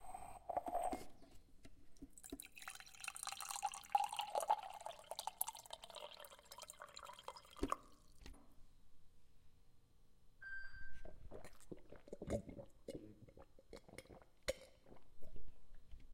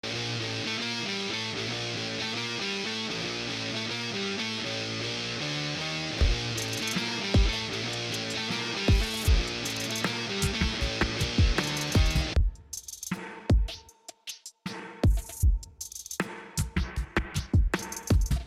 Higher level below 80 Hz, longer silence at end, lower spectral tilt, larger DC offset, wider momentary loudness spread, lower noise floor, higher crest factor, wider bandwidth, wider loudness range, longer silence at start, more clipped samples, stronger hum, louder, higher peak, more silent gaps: second, -62 dBFS vs -32 dBFS; about the same, 0 s vs 0 s; about the same, -3 dB/octave vs -4 dB/octave; neither; first, 23 LU vs 10 LU; first, -66 dBFS vs -51 dBFS; first, 30 dB vs 16 dB; about the same, 16.5 kHz vs 15.5 kHz; first, 14 LU vs 4 LU; about the same, 0 s vs 0.05 s; neither; neither; second, -48 LUFS vs -29 LUFS; second, -16 dBFS vs -12 dBFS; neither